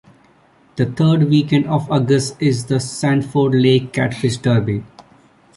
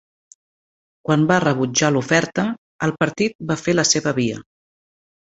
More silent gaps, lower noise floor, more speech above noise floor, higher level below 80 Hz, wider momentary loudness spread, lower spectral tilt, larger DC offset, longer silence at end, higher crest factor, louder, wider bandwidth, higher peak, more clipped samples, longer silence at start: second, none vs 2.58-2.79 s, 3.35-3.39 s; second, -52 dBFS vs under -90 dBFS; second, 36 dB vs over 71 dB; first, -50 dBFS vs -56 dBFS; about the same, 7 LU vs 8 LU; first, -6.5 dB/octave vs -4 dB/octave; neither; second, 0.55 s vs 0.9 s; about the same, 16 dB vs 20 dB; about the same, -17 LUFS vs -19 LUFS; first, 11.5 kHz vs 8.2 kHz; about the same, -2 dBFS vs 0 dBFS; neither; second, 0.75 s vs 1.1 s